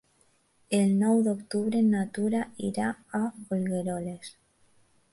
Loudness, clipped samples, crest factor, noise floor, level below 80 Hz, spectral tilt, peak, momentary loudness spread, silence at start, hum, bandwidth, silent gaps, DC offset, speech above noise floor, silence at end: -28 LUFS; under 0.1%; 16 dB; -67 dBFS; -68 dBFS; -6.5 dB/octave; -12 dBFS; 10 LU; 0.7 s; none; 11.5 kHz; none; under 0.1%; 40 dB; 0.85 s